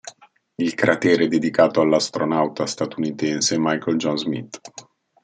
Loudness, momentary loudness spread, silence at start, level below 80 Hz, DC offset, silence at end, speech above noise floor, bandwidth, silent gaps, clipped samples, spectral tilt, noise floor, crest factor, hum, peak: -20 LUFS; 12 LU; 0.05 s; -66 dBFS; under 0.1%; 0.45 s; 23 dB; 9.4 kHz; none; under 0.1%; -4 dB/octave; -44 dBFS; 20 dB; none; -2 dBFS